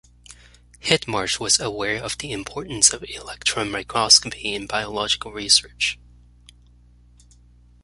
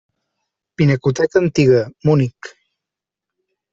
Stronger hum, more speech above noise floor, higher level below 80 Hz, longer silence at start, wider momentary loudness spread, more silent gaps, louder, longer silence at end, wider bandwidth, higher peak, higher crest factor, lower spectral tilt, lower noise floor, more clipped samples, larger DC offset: first, 60 Hz at -45 dBFS vs none; second, 29 dB vs 70 dB; about the same, -50 dBFS vs -50 dBFS; second, 0.3 s vs 0.8 s; first, 16 LU vs 11 LU; neither; second, -20 LUFS vs -16 LUFS; first, 1.9 s vs 1.25 s; first, 11.5 kHz vs 7.8 kHz; about the same, 0 dBFS vs -2 dBFS; first, 24 dB vs 16 dB; second, -1 dB/octave vs -7.5 dB/octave; second, -52 dBFS vs -85 dBFS; neither; neither